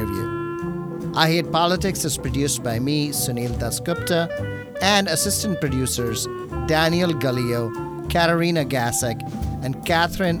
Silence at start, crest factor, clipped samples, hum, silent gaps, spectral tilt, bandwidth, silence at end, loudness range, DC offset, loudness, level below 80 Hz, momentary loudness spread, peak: 0 s; 20 dB; under 0.1%; none; none; -4 dB/octave; over 20 kHz; 0 s; 1 LU; under 0.1%; -22 LUFS; -38 dBFS; 9 LU; -2 dBFS